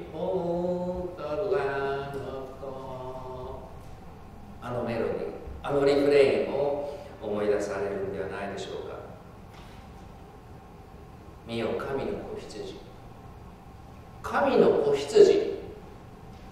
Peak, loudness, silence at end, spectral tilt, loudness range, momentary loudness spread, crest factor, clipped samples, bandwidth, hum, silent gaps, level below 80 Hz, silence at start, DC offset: -6 dBFS; -28 LUFS; 0 s; -6 dB/octave; 12 LU; 26 LU; 24 dB; under 0.1%; 12.5 kHz; none; none; -50 dBFS; 0 s; under 0.1%